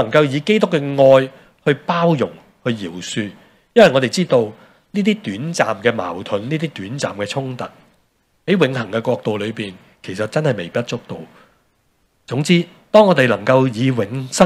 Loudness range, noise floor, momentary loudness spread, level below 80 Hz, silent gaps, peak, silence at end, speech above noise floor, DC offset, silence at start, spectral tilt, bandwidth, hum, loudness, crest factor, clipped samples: 6 LU; -62 dBFS; 15 LU; -60 dBFS; none; 0 dBFS; 0 s; 45 dB; under 0.1%; 0 s; -5.5 dB/octave; 13.5 kHz; none; -17 LUFS; 18 dB; under 0.1%